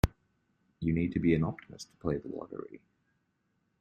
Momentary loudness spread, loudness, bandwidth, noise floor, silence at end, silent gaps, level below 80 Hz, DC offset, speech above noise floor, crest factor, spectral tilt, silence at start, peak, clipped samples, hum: 17 LU; -33 LUFS; 13 kHz; -77 dBFS; 1.05 s; none; -46 dBFS; under 0.1%; 45 dB; 24 dB; -7.5 dB/octave; 0.05 s; -10 dBFS; under 0.1%; none